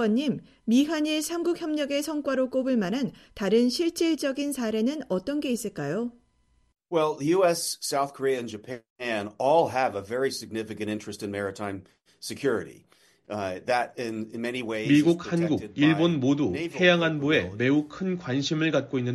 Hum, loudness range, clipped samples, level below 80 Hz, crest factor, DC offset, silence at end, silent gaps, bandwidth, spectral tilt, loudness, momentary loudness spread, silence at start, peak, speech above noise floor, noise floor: none; 8 LU; under 0.1%; -64 dBFS; 20 dB; under 0.1%; 0 s; 8.90-8.96 s; 13.5 kHz; -5 dB/octave; -26 LUFS; 11 LU; 0 s; -6 dBFS; 40 dB; -66 dBFS